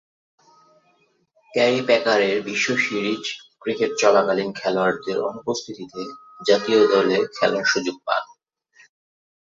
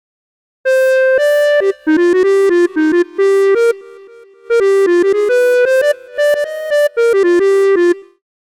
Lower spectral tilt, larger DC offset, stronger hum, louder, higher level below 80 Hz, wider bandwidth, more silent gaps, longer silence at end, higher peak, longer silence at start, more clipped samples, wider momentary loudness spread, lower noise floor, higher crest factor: about the same, -3.5 dB/octave vs -3 dB/octave; neither; neither; second, -21 LUFS vs -12 LUFS; second, -68 dBFS vs -60 dBFS; second, 7.8 kHz vs 16 kHz; neither; first, 1.2 s vs 0.55 s; about the same, -2 dBFS vs -4 dBFS; first, 1.55 s vs 0.65 s; neither; first, 14 LU vs 5 LU; first, -63 dBFS vs -39 dBFS; first, 20 dB vs 10 dB